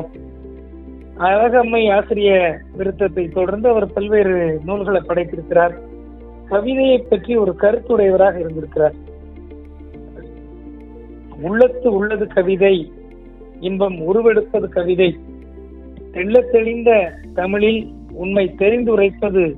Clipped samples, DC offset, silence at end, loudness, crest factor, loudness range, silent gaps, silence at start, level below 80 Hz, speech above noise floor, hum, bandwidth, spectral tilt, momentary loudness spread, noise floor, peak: under 0.1%; under 0.1%; 0 s; -16 LUFS; 16 dB; 4 LU; none; 0 s; -38 dBFS; 22 dB; none; 4.1 kHz; -9.5 dB/octave; 23 LU; -38 dBFS; 0 dBFS